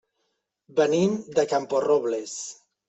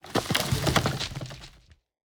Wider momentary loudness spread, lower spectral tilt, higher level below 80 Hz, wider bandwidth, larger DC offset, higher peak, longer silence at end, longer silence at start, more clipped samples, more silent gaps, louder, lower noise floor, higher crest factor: second, 12 LU vs 16 LU; about the same, -5 dB/octave vs -4 dB/octave; second, -68 dBFS vs -44 dBFS; second, 8.2 kHz vs over 20 kHz; neither; second, -8 dBFS vs -4 dBFS; second, 0.35 s vs 0.65 s; first, 0.75 s vs 0.05 s; neither; neither; first, -24 LUFS vs -27 LUFS; first, -76 dBFS vs -57 dBFS; second, 18 dB vs 26 dB